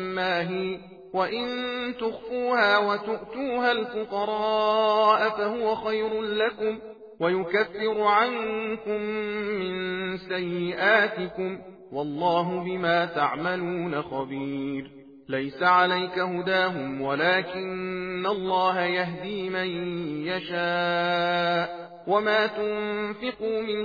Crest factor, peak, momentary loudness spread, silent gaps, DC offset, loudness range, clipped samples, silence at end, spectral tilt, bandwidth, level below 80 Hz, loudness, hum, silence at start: 18 dB; -8 dBFS; 10 LU; none; under 0.1%; 3 LU; under 0.1%; 0 s; -6.5 dB/octave; 5 kHz; -64 dBFS; -26 LUFS; none; 0 s